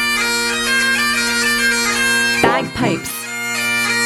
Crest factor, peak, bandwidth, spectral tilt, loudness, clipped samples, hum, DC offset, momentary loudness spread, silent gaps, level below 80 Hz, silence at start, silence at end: 16 dB; 0 dBFS; 18 kHz; -2 dB/octave; -15 LUFS; under 0.1%; none; under 0.1%; 6 LU; none; -46 dBFS; 0 s; 0 s